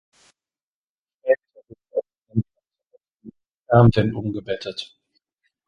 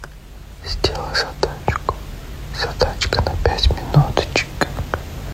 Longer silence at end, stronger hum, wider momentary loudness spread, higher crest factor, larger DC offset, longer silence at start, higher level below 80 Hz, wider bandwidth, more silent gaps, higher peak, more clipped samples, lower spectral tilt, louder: first, 0.85 s vs 0 s; neither; about the same, 17 LU vs 17 LU; about the same, 22 dB vs 20 dB; neither; first, 1.25 s vs 0 s; second, -48 dBFS vs -26 dBFS; second, 7.2 kHz vs 16 kHz; first, 3.54-3.62 s vs none; about the same, -2 dBFS vs -2 dBFS; neither; first, -8.5 dB/octave vs -5 dB/octave; about the same, -22 LUFS vs -20 LUFS